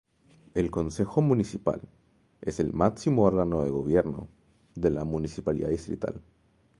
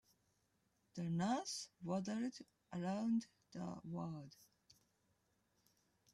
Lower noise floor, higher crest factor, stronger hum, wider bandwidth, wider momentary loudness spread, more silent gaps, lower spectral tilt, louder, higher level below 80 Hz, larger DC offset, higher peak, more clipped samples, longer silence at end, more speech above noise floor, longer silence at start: second, -59 dBFS vs -82 dBFS; about the same, 22 dB vs 18 dB; neither; second, 11.5 kHz vs 13.5 kHz; about the same, 13 LU vs 15 LU; neither; first, -8 dB/octave vs -5.5 dB/octave; first, -28 LUFS vs -44 LUFS; first, -48 dBFS vs -82 dBFS; neither; first, -6 dBFS vs -28 dBFS; neither; second, 0.6 s vs 1.7 s; second, 33 dB vs 38 dB; second, 0.55 s vs 0.95 s